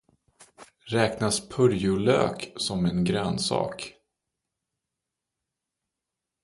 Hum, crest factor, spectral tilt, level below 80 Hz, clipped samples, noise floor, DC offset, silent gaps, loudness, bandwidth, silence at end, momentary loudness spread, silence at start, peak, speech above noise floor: none; 20 dB; -5 dB/octave; -54 dBFS; under 0.1%; -86 dBFS; under 0.1%; none; -26 LUFS; 11.5 kHz; 2.5 s; 8 LU; 0.6 s; -8 dBFS; 61 dB